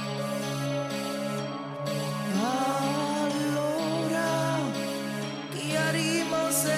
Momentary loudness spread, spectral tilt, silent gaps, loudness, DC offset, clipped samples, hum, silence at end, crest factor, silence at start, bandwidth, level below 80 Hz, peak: 7 LU; -4.5 dB/octave; none; -29 LUFS; under 0.1%; under 0.1%; none; 0 s; 16 dB; 0 s; 16 kHz; -70 dBFS; -14 dBFS